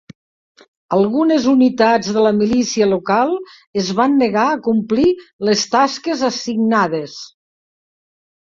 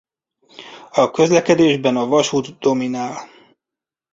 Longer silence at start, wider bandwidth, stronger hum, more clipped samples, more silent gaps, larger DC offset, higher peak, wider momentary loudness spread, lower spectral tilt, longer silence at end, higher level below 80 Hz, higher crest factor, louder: first, 0.9 s vs 0.6 s; about the same, 7.6 kHz vs 7.8 kHz; neither; neither; first, 3.67-3.74 s, 5.33-5.39 s vs none; neither; about the same, -2 dBFS vs -2 dBFS; second, 7 LU vs 16 LU; about the same, -5 dB/octave vs -5 dB/octave; first, 1.3 s vs 0.9 s; about the same, -54 dBFS vs -58 dBFS; about the same, 16 dB vs 16 dB; about the same, -16 LUFS vs -17 LUFS